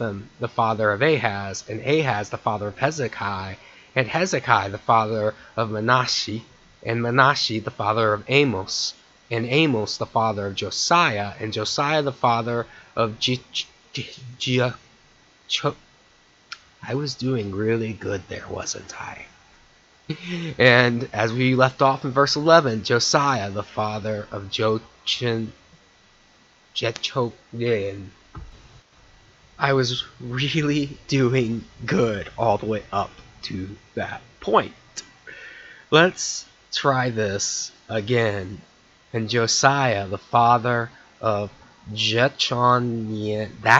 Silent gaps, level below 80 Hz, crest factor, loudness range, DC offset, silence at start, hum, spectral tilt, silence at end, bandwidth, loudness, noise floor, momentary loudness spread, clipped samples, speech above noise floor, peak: none; -56 dBFS; 24 dB; 8 LU; under 0.1%; 0 s; none; -4.5 dB/octave; 0 s; 8.2 kHz; -22 LUFS; -56 dBFS; 15 LU; under 0.1%; 34 dB; 0 dBFS